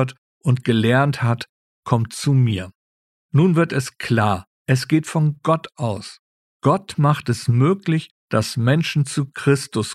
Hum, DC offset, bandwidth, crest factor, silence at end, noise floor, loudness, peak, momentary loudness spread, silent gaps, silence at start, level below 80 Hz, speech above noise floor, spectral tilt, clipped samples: none; under 0.1%; 13.5 kHz; 18 dB; 0 s; under -90 dBFS; -20 LUFS; -2 dBFS; 9 LU; 0.18-0.41 s, 1.49-1.83 s, 2.75-3.29 s, 4.47-4.65 s, 6.19-6.60 s, 8.11-8.28 s; 0 s; -56 dBFS; over 71 dB; -6.5 dB/octave; under 0.1%